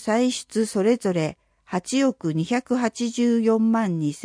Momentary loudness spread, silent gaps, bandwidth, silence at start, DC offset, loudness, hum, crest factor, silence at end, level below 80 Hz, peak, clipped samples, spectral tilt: 7 LU; none; 10.5 kHz; 0 s; under 0.1%; -23 LUFS; none; 14 dB; 0 s; -64 dBFS; -8 dBFS; under 0.1%; -5.5 dB/octave